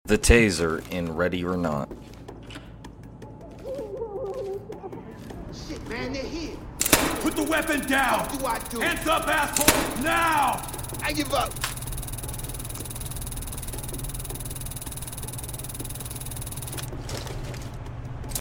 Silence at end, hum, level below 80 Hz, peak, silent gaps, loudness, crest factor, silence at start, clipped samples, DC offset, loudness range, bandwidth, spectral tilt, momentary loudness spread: 0 s; none; -38 dBFS; -2 dBFS; none; -26 LUFS; 26 dB; 0.05 s; under 0.1%; under 0.1%; 12 LU; 17 kHz; -3.5 dB/octave; 19 LU